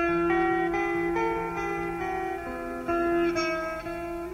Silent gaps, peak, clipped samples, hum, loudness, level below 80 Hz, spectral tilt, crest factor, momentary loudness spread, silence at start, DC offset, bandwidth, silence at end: none; -14 dBFS; under 0.1%; none; -28 LUFS; -48 dBFS; -6 dB/octave; 14 dB; 9 LU; 0 s; under 0.1%; 14.5 kHz; 0 s